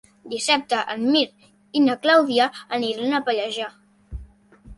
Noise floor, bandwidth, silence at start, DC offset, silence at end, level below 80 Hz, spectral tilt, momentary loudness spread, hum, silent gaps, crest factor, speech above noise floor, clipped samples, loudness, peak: -47 dBFS; 11.5 kHz; 0.25 s; under 0.1%; 0.05 s; -48 dBFS; -3 dB/octave; 18 LU; none; none; 18 dB; 26 dB; under 0.1%; -21 LUFS; -4 dBFS